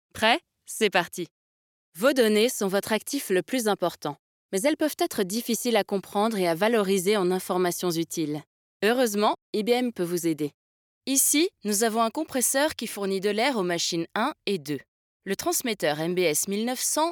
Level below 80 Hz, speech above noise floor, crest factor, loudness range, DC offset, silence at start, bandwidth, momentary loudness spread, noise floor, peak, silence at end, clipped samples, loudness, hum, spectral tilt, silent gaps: -70 dBFS; over 65 dB; 20 dB; 2 LU; under 0.1%; 0.15 s; over 20 kHz; 9 LU; under -90 dBFS; -6 dBFS; 0 s; under 0.1%; -25 LUFS; none; -3 dB/octave; 1.31-1.92 s, 4.19-4.49 s, 8.47-8.80 s, 9.42-9.53 s, 10.54-11.01 s, 14.88-15.20 s